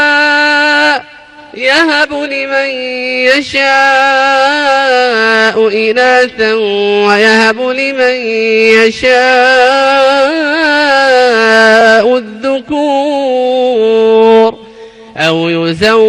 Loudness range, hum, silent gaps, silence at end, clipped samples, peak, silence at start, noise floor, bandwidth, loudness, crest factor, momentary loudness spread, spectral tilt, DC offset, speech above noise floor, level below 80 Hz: 3 LU; none; none; 0 s; 0.6%; 0 dBFS; 0 s; -34 dBFS; 11 kHz; -8 LUFS; 8 dB; 7 LU; -3.5 dB/octave; under 0.1%; 25 dB; -48 dBFS